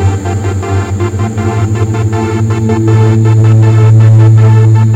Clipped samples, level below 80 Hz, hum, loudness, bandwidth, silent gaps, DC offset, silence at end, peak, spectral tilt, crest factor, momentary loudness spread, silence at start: 2%; -36 dBFS; none; -8 LUFS; 8 kHz; none; under 0.1%; 0 s; 0 dBFS; -8 dB/octave; 6 dB; 9 LU; 0 s